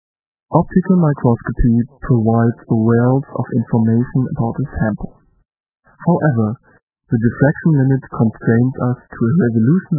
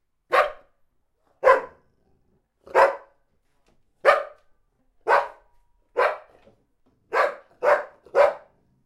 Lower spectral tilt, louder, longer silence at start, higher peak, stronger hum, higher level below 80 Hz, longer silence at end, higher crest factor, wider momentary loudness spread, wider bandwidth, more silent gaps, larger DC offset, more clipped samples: first, -16.5 dB/octave vs -3 dB/octave; first, -16 LUFS vs -22 LUFS; first, 0.5 s vs 0.3 s; about the same, 0 dBFS vs -2 dBFS; neither; first, -34 dBFS vs -64 dBFS; second, 0 s vs 0.45 s; second, 16 dB vs 22 dB; second, 7 LU vs 17 LU; second, 2 kHz vs 13 kHz; first, 6.82-6.87 s vs none; neither; neither